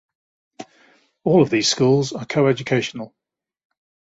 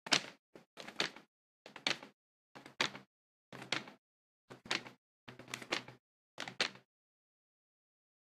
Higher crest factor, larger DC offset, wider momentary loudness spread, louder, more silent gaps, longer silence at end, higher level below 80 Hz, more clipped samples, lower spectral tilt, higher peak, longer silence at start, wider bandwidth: second, 18 dB vs 34 dB; neither; second, 13 LU vs 21 LU; first, -19 LUFS vs -39 LUFS; second, none vs 0.39-0.53 s, 0.66-0.77 s, 1.28-1.65 s, 2.14-2.55 s, 3.07-3.52 s, 3.98-4.48 s, 4.98-5.27 s, 5.99-6.38 s; second, 1 s vs 1.45 s; first, -60 dBFS vs -84 dBFS; neither; first, -5 dB/octave vs -1.5 dB/octave; first, -4 dBFS vs -12 dBFS; first, 0.6 s vs 0.05 s; second, 8 kHz vs 14.5 kHz